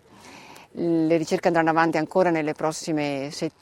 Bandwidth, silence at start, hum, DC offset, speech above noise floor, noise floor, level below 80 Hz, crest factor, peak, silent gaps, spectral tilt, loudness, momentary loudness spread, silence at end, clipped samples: 13 kHz; 0.25 s; none; under 0.1%; 24 dB; -47 dBFS; -66 dBFS; 20 dB; -4 dBFS; none; -5.5 dB/octave; -23 LUFS; 9 LU; 0.1 s; under 0.1%